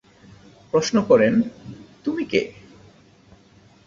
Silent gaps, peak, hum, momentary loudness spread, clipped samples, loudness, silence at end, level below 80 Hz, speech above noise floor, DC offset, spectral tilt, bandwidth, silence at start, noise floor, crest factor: none; -4 dBFS; none; 18 LU; under 0.1%; -21 LUFS; 1.35 s; -58 dBFS; 33 dB; under 0.1%; -5.5 dB/octave; 7.6 kHz; 0.75 s; -53 dBFS; 20 dB